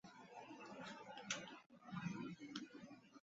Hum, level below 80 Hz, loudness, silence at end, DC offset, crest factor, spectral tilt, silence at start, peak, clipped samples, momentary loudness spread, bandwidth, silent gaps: none; -86 dBFS; -52 LUFS; 0 s; under 0.1%; 26 dB; -3.5 dB/octave; 0.05 s; -28 dBFS; under 0.1%; 12 LU; 7.6 kHz; 1.66-1.70 s